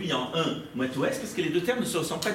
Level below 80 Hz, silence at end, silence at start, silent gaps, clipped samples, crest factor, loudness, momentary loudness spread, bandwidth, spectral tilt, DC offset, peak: -62 dBFS; 0 s; 0 s; none; under 0.1%; 18 dB; -28 LUFS; 3 LU; 16.5 kHz; -4 dB/octave; under 0.1%; -12 dBFS